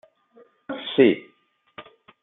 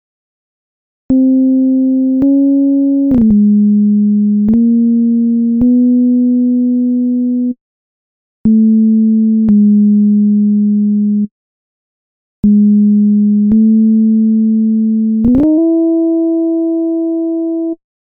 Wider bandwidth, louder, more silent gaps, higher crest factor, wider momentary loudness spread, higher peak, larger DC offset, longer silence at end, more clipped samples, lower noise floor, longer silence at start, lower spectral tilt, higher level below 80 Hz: first, 4 kHz vs 1.2 kHz; second, -21 LUFS vs -11 LUFS; second, none vs 7.61-8.44 s, 11.31-12.43 s; first, 22 dB vs 8 dB; first, 26 LU vs 6 LU; about the same, -4 dBFS vs -2 dBFS; neither; first, 0.4 s vs 0.25 s; neither; second, -64 dBFS vs under -90 dBFS; second, 0.7 s vs 1.1 s; second, -9.5 dB/octave vs -14.5 dB/octave; second, -72 dBFS vs -40 dBFS